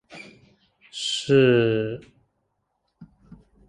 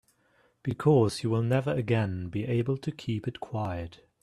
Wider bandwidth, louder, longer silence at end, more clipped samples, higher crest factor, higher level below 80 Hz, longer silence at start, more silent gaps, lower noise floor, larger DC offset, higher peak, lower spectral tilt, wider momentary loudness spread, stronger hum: about the same, 11 kHz vs 12 kHz; first, -21 LUFS vs -29 LUFS; first, 0.65 s vs 0.3 s; neither; about the same, 20 dB vs 18 dB; about the same, -60 dBFS vs -58 dBFS; second, 0.1 s vs 0.65 s; neither; first, -75 dBFS vs -67 dBFS; neither; first, -6 dBFS vs -10 dBFS; second, -5.5 dB/octave vs -7.5 dB/octave; first, 24 LU vs 12 LU; neither